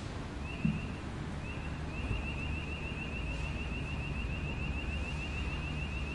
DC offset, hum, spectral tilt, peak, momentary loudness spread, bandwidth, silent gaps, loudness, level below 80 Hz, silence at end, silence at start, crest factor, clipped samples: under 0.1%; none; -6 dB/octave; -18 dBFS; 5 LU; 11 kHz; none; -38 LUFS; -42 dBFS; 0 s; 0 s; 18 dB; under 0.1%